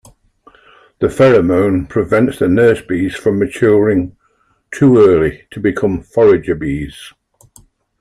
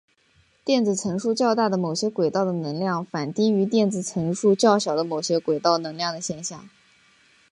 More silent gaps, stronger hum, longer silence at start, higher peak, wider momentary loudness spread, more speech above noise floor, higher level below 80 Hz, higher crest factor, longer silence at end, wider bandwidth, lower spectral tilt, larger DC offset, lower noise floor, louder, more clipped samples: neither; neither; first, 1 s vs 0.65 s; first, 0 dBFS vs -4 dBFS; about the same, 10 LU vs 9 LU; first, 46 dB vs 39 dB; first, -40 dBFS vs -66 dBFS; about the same, 14 dB vs 18 dB; about the same, 0.9 s vs 0.85 s; first, 13.5 kHz vs 11.5 kHz; first, -7.5 dB/octave vs -5 dB/octave; neither; about the same, -59 dBFS vs -62 dBFS; first, -13 LUFS vs -23 LUFS; neither